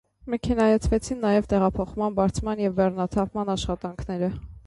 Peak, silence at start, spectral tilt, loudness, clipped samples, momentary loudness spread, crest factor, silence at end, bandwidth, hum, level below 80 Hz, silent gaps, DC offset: -8 dBFS; 0.25 s; -6.5 dB/octave; -25 LUFS; under 0.1%; 9 LU; 16 dB; 0.05 s; 11.5 kHz; none; -38 dBFS; none; under 0.1%